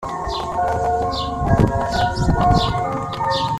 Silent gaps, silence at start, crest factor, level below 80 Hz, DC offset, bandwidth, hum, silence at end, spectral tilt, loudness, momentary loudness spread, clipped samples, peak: none; 0 s; 16 dB; -30 dBFS; under 0.1%; 13.5 kHz; none; 0 s; -6 dB/octave; -20 LUFS; 7 LU; under 0.1%; -2 dBFS